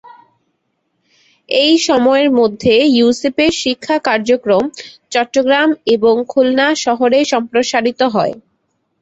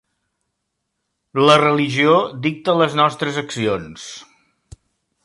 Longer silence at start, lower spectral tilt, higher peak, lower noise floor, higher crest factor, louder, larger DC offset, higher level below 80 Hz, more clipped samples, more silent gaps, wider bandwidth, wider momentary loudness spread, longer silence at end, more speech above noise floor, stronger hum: first, 1.5 s vs 1.35 s; second, -3.5 dB/octave vs -5 dB/octave; about the same, -2 dBFS vs -2 dBFS; second, -67 dBFS vs -75 dBFS; second, 12 dB vs 18 dB; first, -13 LUFS vs -17 LUFS; neither; about the same, -52 dBFS vs -56 dBFS; neither; neither; second, 8.2 kHz vs 11.5 kHz; second, 7 LU vs 19 LU; second, 0.6 s vs 1 s; second, 54 dB vs 58 dB; neither